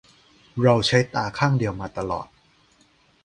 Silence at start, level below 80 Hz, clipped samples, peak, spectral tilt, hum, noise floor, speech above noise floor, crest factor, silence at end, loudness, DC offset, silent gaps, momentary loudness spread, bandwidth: 0.55 s; -50 dBFS; under 0.1%; -2 dBFS; -5.5 dB/octave; none; -60 dBFS; 38 dB; 22 dB; 1 s; -22 LUFS; under 0.1%; none; 13 LU; 10.5 kHz